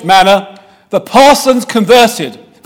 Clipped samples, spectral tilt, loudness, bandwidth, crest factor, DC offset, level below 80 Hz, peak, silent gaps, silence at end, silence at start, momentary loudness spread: 3%; -3.5 dB/octave; -8 LUFS; 18.5 kHz; 10 dB; under 0.1%; -42 dBFS; 0 dBFS; none; 0.3 s; 0 s; 12 LU